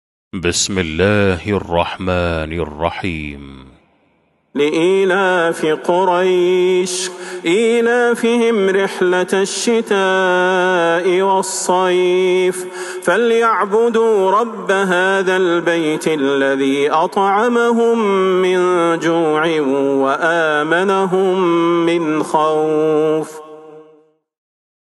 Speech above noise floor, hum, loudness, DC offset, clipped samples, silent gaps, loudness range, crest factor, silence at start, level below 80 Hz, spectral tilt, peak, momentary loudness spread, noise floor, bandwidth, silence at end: 44 dB; none; -15 LUFS; under 0.1%; under 0.1%; none; 4 LU; 14 dB; 0.35 s; -44 dBFS; -4.5 dB/octave; 0 dBFS; 6 LU; -59 dBFS; 12.5 kHz; 1.15 s